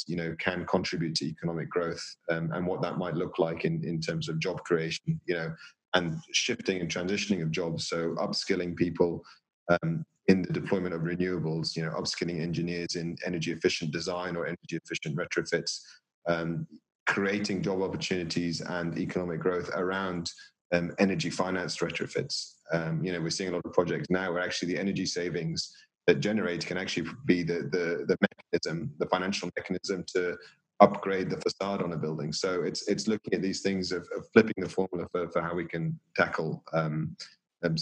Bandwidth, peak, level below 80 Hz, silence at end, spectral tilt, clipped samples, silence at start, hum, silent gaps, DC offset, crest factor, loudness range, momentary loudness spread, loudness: 10 kHz; -4 dBFS; -64 dBFS; 0 s; -5 dB/octave; under 0.1%; 0 s; none; 5.88-5.92 s, 9.53-9.66 s, 16.14-16.22 s, 16.95-17.06 s, 20.61-20.70 s; under 0.1%; 28 dB; 3 LU; 7 LU; -30 LUFS